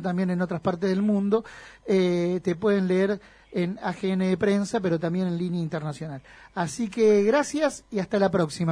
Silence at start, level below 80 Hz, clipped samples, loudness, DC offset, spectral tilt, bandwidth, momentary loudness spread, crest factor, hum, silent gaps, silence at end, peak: 0 s; -60 dBFS; under 0.1%; -25 LUFS; under 0.1%; -6.5 dB/octave; 10.5 kHz; 11 LU; 16 dB; none; none; 0 s; -10 dBFS